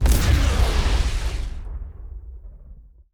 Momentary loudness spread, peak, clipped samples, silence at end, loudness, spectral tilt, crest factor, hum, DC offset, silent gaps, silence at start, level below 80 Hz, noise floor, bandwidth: 21 LU; -6 dBFS; under 0.1%; 0.3 s; -22 LUFS; -5 dB/octave; 16 dB; none; under 0.1%; none; 0 s; -22 dBFS; -44 dBFS; over 20 kHz